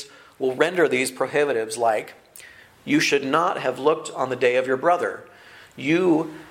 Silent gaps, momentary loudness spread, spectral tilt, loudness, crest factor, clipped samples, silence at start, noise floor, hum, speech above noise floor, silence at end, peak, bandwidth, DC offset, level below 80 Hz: none; 9 LU; -4 dB/octave; -22 LUFS; 20 dB; under 0.1%; 0 s; -46 dBFS; none; 25 dB; 0 s; -4 dBFS; 16 kHz; under 0.1%; -68 dBFS